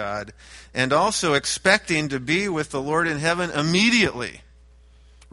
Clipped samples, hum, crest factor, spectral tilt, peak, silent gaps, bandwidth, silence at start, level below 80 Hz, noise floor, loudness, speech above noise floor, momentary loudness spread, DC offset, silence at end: under 0.1%; none; 20 dB; -3.5 dB/octave; -2 dBFS; none; 11.5 kHz; 0 s; -50 dBFS; -51 dBFS; -21 LUFS; 28 dB; 13 LU; under 0.1%; 0.95 s